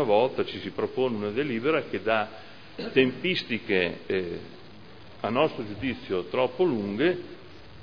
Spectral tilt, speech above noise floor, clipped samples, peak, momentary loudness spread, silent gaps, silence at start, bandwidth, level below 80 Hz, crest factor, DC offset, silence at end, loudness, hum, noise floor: -7.5 dB/octave; 21 dB; under 0.1%; -6 dBFS; 14 LU; none; 0 s; 5.4 kHz; -62 dBFS; 22 dB; 0.4%; 0 s; -27 LUFS; none; -48 dBFS